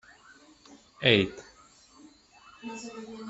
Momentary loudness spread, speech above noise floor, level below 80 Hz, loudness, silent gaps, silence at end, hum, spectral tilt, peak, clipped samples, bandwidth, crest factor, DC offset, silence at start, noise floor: 22 LU; 29 dB; -64 dBFS; -26 LUFS; none; 0 s; none; -5 dB/octave; -6 dBFS; under 0.1%; 8.2 kHz; 28 dB; under 0.1%; 0.7 s; -57 dBFS